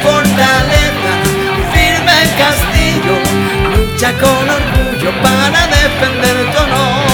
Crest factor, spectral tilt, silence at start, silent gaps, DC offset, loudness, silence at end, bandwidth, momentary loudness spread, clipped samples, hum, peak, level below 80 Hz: 10 dB; -4 dB/octave; 0 s; none; under 0.1%; -10 LUFS; 0 s; 18 kHz; 4 LU; under 0.1%; none; 0 dBFS; -20 dBFS